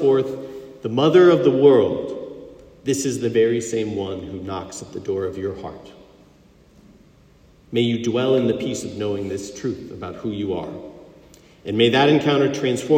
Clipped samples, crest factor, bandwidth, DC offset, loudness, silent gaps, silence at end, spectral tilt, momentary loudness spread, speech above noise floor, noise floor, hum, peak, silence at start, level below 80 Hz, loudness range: under 0.1%; 18 dB; 15.5 kHz; under 0.1%; -20 LUFS; none; 0 s; -5.5 dB/octave; 19 LU; 32 dB; -52 dBFS; none; -2 dBFS; 0 s; -56 dBFS; 12 LU